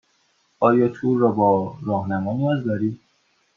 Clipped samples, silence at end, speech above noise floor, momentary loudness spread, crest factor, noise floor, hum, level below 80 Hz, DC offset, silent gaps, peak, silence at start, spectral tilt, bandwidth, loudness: under 0.1%; 0.6 s; 45 dB; 8 LU; 18 dB; -65 dBFS; none; -66 dBFS; under 0.1%; none; -4 dBFS; 0.6 s; -10 dB/octave; 6.8 kHz; -21 LUFS